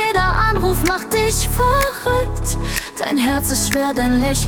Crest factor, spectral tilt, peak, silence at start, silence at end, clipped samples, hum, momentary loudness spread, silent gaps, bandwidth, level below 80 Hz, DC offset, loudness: 16 dB; -4 dB/octave; -2 dBFS; 0 s; 0 s; under 0.1%; none; 6 LU; none; 18 kHz; -26 dBFS; 0.1%; -18 LUFS